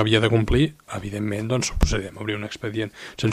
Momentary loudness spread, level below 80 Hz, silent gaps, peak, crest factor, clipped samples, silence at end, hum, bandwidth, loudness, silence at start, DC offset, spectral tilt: 11 LU; -30 dBFS; none; -4 dBFS; 18 dB; under 0.1%; 0 s; none; 15.5 kHz; -24 LUFS; 0 s; under 0.1%; -5 dB/octave